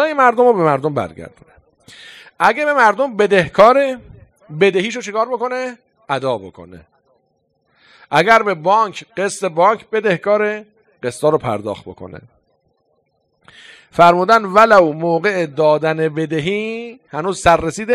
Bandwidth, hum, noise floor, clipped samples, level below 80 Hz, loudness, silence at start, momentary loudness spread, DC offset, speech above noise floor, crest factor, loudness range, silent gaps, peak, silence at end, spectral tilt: 14 kHz; none; -65 dBFS; 0.2%; -48 dBFS; -15 LUFS; 0 s; 16 LU; under 0.1%; 50 dB; 16 dB; 8 LU; none; 0 dBFS; 0 s; -5 dB/octave